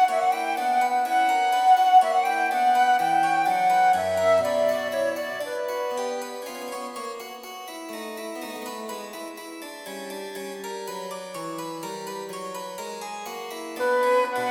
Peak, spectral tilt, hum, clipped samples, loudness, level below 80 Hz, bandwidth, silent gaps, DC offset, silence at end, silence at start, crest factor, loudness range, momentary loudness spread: -8 dBFS; -2.5 dB/octave; none; under 0.1%; -24 LUFS; -74 dBFS; 17 kHz; none; under 0.1%; 0 s; 0 s; 18 dB; 15 LU; 15 LU